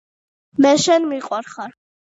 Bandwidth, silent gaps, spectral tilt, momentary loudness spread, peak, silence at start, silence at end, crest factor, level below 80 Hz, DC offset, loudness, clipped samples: 8 kHz; none; -3.5 dB/octave; 19 LU; -4 dBFS; 0.6 s; 0.5 s; 16 dB; -66 dBFS; under 0.1%; -17 LUFS; under 0.1%